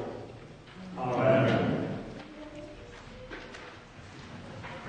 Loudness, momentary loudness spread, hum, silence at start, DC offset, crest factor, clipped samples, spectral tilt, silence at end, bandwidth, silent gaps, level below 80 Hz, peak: -29 LUFS; 22 LU; none; 0 s; under 0.1%; 20 dB; under 0.1%; -7.5 dB/octave; 0 s; 9.4 kHz; none; -56 dBFS; -12 dBFS